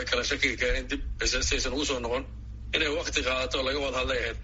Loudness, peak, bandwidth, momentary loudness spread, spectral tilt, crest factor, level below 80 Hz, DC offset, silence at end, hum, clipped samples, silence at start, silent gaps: -28 LUFS; -10 dBFS; 8 kHz; 7 LU; -1.5 dB/octave; 20 dB; -38 dBFS; under 0.1%; 0 s; none; under 0.1%; 0 s; none